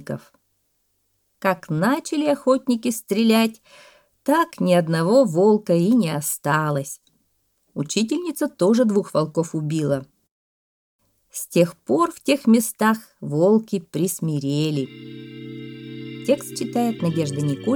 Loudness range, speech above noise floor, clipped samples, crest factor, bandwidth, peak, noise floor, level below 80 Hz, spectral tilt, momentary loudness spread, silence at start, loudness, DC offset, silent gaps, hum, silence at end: 5 LU; 48 dB; under 0.1%; 18 dB; 19.5 kHz; -4 dBFS; -69 dBFS; -68 dBFS; -5.5 dB/octave; 17 LU; 0 s; -21 LUFS; under 0.1%; 10.31-10.99 s; none; 0 s